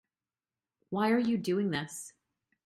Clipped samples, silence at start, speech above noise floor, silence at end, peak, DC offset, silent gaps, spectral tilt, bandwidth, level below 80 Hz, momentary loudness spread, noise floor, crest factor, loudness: under 0.1%; 0.9 s; over 60 dB; 0.55 s; -18 dBFS; under 0.1%; none; -5.5 dB/octave; 13.5 kHz; -74 dBFS; 15 LU; under -90 dBFS; 16 dB; -31 LUFS